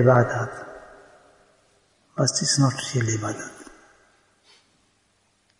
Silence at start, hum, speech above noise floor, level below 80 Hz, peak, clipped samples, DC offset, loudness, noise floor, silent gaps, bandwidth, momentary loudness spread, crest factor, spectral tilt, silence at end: 0 s; none; 44 dB; -60 dBFS; -4 dBFS; under 0.1%; under 0.1%; -23 LUFS; -66 dBFS; none; 11 kHz; 20 LU; 22 dB; -4.5 dB/octave; 1.95 s